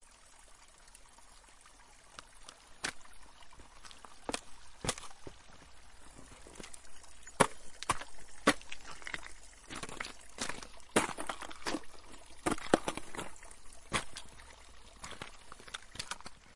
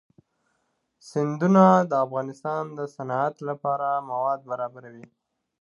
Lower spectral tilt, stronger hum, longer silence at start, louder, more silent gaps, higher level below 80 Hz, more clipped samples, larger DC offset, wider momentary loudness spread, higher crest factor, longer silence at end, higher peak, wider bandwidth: second, -3 dB/octave vs -8 dB/octave; neither; second, 0 s vs 1.05 s; second, -38 LUFS vs -24 LUFS; neither; first, -58 dBFS vs -76 dBFS; neither; neither; first, 25 LU vs 15 LU; first, 34 dB vs 22 dB; second, 0 s vs 0.6 s; about the same, -6 dBFS vs -4 dBFS; first, 11.5 kHz vs 7.4 kHz